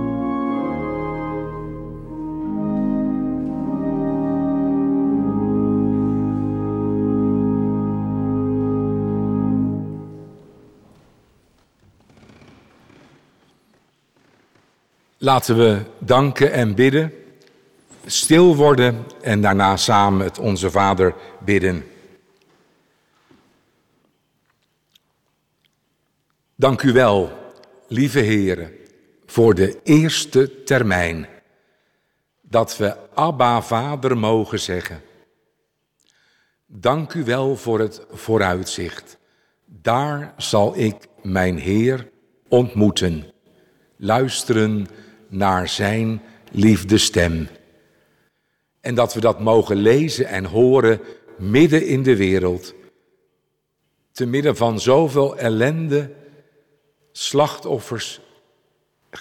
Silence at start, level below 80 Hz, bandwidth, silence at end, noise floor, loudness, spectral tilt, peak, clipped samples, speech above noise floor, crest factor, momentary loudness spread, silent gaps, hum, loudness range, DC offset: 0 s; -46 dBFS; 16.5 kHz; 0 s; -71 dBFS; -19 LUFS; -5.5 dB/octave; -4 dBFS; under 0.1%; 54 dB; 16 dB; 13 LU; none; none; 8 LU; under 0.1%